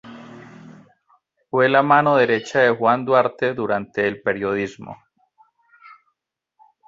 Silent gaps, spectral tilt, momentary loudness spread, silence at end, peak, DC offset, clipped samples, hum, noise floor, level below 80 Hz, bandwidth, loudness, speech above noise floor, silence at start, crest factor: none; -6 dB/octave; 24 LU; 0.95 s; -2 dBFS; under 0.1%; under 0.1%; none; -78 dBFS; -62 dBFS; 7.8 kHz; -19 LUFS; 59 dB; 0.05 s; 20 dB